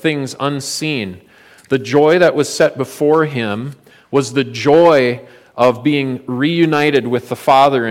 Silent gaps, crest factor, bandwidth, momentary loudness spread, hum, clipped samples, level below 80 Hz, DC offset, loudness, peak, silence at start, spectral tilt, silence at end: none; 14 dB; 16.5 kHz; 10 LU; none; under 0.1%; -58 dBFS; under 0.1%; -14 LUFS; -2 dBFS; 0.05 s; -5.5 dB/octave; 0 s